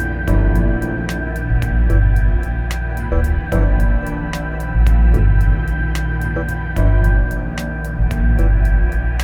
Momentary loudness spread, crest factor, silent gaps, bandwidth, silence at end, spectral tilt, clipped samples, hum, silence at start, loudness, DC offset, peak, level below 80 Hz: 8 LU; 12 dB; none; 11 kHz; 0 s; -7.5 dB/octave; under 0.1%; none; 0 s; -18 LUFS; under 0.1%; -2 dBFS; -16 dBFS